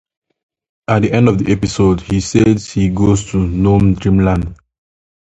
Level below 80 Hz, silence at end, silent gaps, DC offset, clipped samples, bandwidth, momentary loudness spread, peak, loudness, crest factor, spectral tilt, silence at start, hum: -30 dBFS; 0.75 s; none; under 0.1%; under 0.1%; 8.4 kHz; 6 LU; 0 dBFS; -14 LUFS; 14 dB; -7 dB/octave; 0.9 s; none